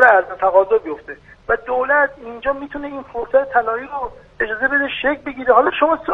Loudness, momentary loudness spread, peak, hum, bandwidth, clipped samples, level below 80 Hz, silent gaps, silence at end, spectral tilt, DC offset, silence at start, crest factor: -18 LUFS; 14 LU; 0 dBFS; none; 4.9 kHz; under 0.1%; -48 dBFS; none; 0 s; -6 dB/octave; under 0.1%; 0 s; 18 dB